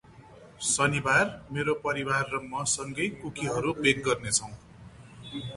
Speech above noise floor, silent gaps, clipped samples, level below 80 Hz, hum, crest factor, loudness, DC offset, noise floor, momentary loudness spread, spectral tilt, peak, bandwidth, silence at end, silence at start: 23 dB; none; under 0.1%; -56 dBFS; none; 20 dB; -27 LUFS; under 0.1%; -51 dBFS; 12 LU; -3 dB/octave; -8 dBFS; 11.5 kHz; 0 s; 0.1 s